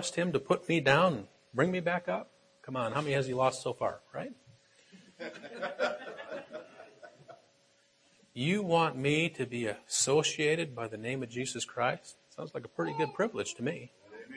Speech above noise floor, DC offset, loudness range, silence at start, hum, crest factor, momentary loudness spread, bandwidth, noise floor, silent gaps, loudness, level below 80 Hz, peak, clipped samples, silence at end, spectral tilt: 36 dB; under 0.1%; 11 LU; 0 s; none; 24 dB; 18 LU; 11 kHz; -68 dBFS; none; -32 LUFS; -72 dBFS; -8 dBFS; under 0.1%; 0 s; -4 dB/octave